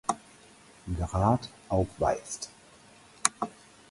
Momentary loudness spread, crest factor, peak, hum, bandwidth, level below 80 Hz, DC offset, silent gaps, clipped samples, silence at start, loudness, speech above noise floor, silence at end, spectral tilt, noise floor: 12 LU; 30 dB; -2 dBFS; none; 11.5 kHz; -46 dBFS; under 0.1%; none; under 0.1%; 0.1 s; -30 LUFS; 26 dB; 0.4 s; -4.5 dB/octave; -55 dBFS